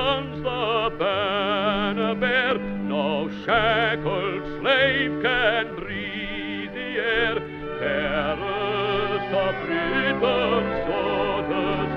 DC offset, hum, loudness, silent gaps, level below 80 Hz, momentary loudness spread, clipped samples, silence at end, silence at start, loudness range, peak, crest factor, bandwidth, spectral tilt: under 0.1%; none; -23 LUFS; none; -44 dBFS; 8 LU; under 0.1%; 0 s; 0 s; 3 LU; -6 dBFS; 18 dB; 6.8 kHz; -7 dB/octave